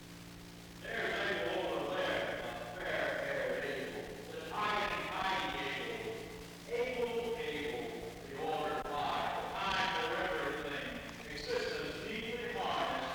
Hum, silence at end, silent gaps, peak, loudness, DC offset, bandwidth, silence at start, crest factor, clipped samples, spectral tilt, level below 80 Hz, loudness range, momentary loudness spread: none; 0 s; none; -20 dBFS; -37 LUFS; under 0.1%; over 20 kHz; 0 s; 18 dB; under 0.1%; -4 dB/octave; -60 dBFS; 2 LU; 10 LU